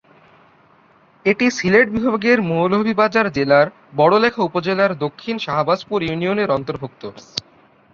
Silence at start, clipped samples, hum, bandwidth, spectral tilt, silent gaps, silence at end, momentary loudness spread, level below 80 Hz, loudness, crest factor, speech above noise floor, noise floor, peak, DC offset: 1.25 s; under 0.1%; none; 7.4 kHz; -6 dB/octave; none; 0.55 s; 14 LU; -54 dBFS; -17 LUFS; 18 dB; 35 dB; -53 dBFS; -2 dBFS; under 0.1%